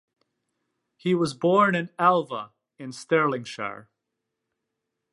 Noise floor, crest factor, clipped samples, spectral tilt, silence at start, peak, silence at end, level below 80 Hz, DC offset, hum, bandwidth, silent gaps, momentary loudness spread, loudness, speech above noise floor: -82 dBFS; 20 dB; under 0.1%; -6 dB/octave; 1.05 s; -8 dBFS; 1.3 s; -72 dBFS; under 0.1%; none; 11.5 kHz; none; 19 LU; -24 LUFS; 58 dB